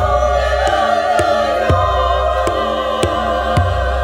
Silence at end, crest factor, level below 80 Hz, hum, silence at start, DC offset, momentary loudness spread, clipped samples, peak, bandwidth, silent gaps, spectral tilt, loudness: 0 s; 14 dB; -24 dBFS; none; 0 s; under 0.1%; 3 LU; under 0.1%; 0 dBFS; 16.5 kHz; none; -5.5 dB/octave; -15 LUFS